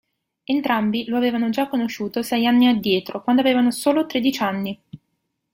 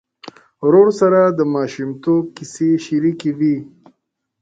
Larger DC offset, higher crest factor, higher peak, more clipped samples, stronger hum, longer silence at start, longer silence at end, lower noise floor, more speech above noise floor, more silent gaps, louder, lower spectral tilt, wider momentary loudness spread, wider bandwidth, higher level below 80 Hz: neither; about the same, 16 dB vs 16 dB; second, -4 dBFS vs 0 dBFS; neither; neither; about the same, 0.5 s vs 0.6 s; second, 0.6 s vs 0.75 s; about the same, -74 dBFS vs -71 dBFS; about the same, 55 dB vs 56 dB; neither; second, -20 LUFS vs -16 LUFS; second, -5 dB/octave vs -7 dB/octave; about the same, 9 LU vs 11 LU; first, 16.5 kHz vs 9 kHz; about the same, -62 dBFS vs -62 dBFS